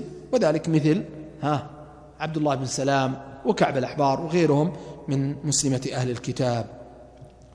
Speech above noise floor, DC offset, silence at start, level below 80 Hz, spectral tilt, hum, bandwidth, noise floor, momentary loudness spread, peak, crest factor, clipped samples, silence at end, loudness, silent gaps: 24 dB; under 0.1%; 0 s; -54 dBFS; -5.5 dB/octave; none; 11 kHz; -47 dBFS; 10 LU; -8 dBFS; 18 dB; under 0.1%; 0.25 s; -24 LUFS; none